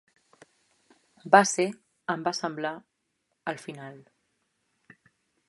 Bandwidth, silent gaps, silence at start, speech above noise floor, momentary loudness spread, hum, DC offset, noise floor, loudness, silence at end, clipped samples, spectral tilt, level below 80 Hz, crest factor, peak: 11.5 kHz; none; 1.25 s; 52 dB; 24 LU; none; under 0.1%; -78 dBFS; -27 LUFS; 1.5 s; under 0.1%; -3.5 dB/octave; -80 dBFS; 28 dB; -2 dBFS